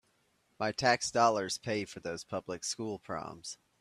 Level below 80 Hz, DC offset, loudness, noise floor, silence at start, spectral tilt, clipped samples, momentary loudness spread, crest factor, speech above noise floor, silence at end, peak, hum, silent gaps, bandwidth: -70 dBFS; under 0.1%; -33 LUFS; -73 dBFS; 0.6 s; -3 dB/octave; under 0.1%; 13 LU; 22 dB; 40 dB; 0.25 s; -12 dBFS; none; none; 14 kHz